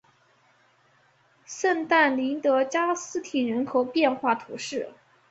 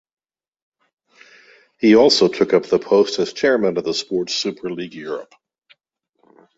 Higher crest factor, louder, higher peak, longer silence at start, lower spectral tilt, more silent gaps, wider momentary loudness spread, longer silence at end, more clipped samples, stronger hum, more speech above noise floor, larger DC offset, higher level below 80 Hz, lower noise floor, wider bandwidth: about the same, 20 dB vs 18 dB; second, -25 LUFS vs -17 LUFS; second, -8 dBFS vs -2 dBFS; second, 1.5 s vs 1.8 s; about the same, -3 dB/octave vs -4 dB/octave; neither; second, 12 LU vs 16 LU; second, 0.4 s vs 1.35 s; neither; neither; second, 38 dB vs 55 dB; neither; second, -74 dBFS vs -60 dBFS; second, -63 dBFS vs -72 dBFS; about the same, 8.2 kHz vs 8 kHz